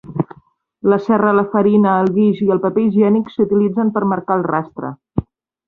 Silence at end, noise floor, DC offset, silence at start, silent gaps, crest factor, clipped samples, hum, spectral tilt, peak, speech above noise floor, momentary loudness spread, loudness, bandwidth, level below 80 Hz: 0.45 s; -51 dBFS; under 0.1%; 0.05 s; none; 14 dB; under 0.1%; none; -10.5 dB/octave; -2 dBFS; 37 dB; 12 LU; -16 LUFS; 4.5 kHz; -48 dBFS